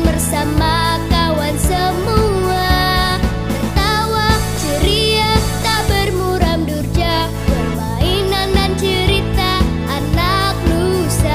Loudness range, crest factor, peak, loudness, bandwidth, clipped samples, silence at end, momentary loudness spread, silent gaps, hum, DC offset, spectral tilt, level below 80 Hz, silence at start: 1 LU; 14 dB; 0 dBFS; -15 LUFS; 16 kHz; under 0.1%; 0 s; 4 LU; none; none; 0.8%; -5 dB/octave; -22 dBFS; 0 s